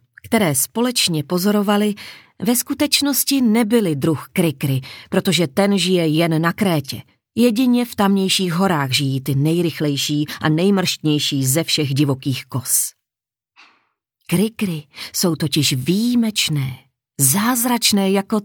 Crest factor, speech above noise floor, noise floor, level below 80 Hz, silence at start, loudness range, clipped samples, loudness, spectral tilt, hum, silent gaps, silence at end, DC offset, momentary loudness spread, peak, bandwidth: 18 dB; 70 dB; -88 dBFS; -60 dBFS; 0.25 s; 3 LU; under 0.1%; -18 LUFS; -4 dB/octave; none; none; 0 s; under 0.1%; 8 LU; 0 dBFS; 20 kHz